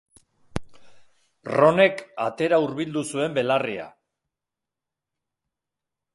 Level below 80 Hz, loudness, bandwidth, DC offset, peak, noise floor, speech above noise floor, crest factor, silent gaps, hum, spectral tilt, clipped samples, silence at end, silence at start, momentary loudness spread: -56 dBFS; -22 LUFS; 11.5 kHz; under 0.1%; -4 dBFS; -86 dBFS; 64 dB; 22 dB; none; none; -5.5 dB/octave; under 0.1%; 2.25 s; 0.55 s; 18 LU